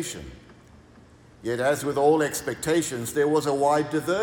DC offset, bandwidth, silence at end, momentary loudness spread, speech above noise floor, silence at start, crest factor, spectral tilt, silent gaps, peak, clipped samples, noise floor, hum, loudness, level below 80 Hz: under 0.1%; 18 kHz; 0 s; 13 LU; 28 dB; 0 s; 16 dB; -4.5 dB/octave; none; -8 dBFS; under 0.1%; -52 dBFS; none; -24 LUFS; -56 dBFS